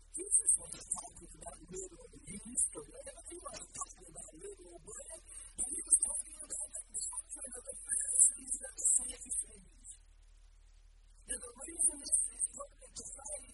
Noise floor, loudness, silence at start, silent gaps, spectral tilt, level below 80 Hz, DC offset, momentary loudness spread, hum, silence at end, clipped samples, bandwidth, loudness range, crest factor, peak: -60 dBFS; -33 LUFS; 0 s; none; -0.5 dB/octave; -60 dBFS; under 0.1%; 21 LU; none; 0 s; under 0.1%; 11.5 kHz; 9 LU; 28 dB; -12 dBFS